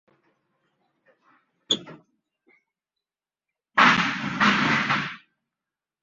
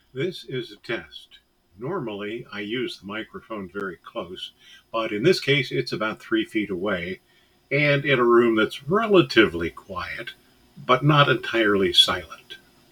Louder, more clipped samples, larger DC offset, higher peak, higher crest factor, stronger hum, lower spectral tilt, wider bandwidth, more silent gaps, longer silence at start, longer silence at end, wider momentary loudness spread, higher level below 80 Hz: about the same, -21 LUFS vs -22 LUFS; neither; neither; about the same, -4 dBFS vs -2 dBFS; about the same, 24 dB vs 22 dB; neither; second, -3.5 dB/octave vs -5.5 dB/octave; second, 7.8 kHz vs 17.5 kHz; neither; first, 1.7 s vs 0.15 s; first, 0.85 s vs 0.35 s; second, 9 LU vs 18 LU; second, -64 dBFS vs -58 dBFS